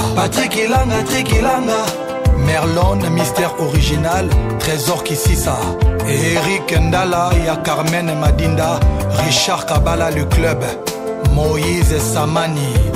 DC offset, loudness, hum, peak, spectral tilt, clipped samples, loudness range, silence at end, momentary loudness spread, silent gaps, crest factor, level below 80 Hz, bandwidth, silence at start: under 0.1%; -16 LUFS; none; -2 dBFS; -5 dB/octave; under 0.1%; 1 LU; 0 s; 3 LU; none; 12 dB; -22 dBFS; 16 kHz; 0 s